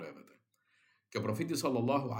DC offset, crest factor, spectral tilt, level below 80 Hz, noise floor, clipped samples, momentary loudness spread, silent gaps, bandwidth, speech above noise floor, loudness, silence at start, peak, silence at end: under 0.1%; 18 dB; -5.5 dB/octave; -80 dBFS; -74 dBFS; under 0.1%; 11 LU; none; 16.5 kHz; 40 dB; -35 LUFS; 0 s; -18 dBFS; 0 s